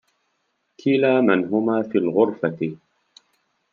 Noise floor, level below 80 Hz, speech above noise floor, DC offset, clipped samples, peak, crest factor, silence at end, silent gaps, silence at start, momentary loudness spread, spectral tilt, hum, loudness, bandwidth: -72 dBFS; -72 dBFS; 52 dB; under 0.1%; under 0.1%; -4 dBFS; 18 dB; 0.95 s; none; 0.85 s; 10 LU; -8 dB/octave; none; -21 LUFS; 6.8 kHz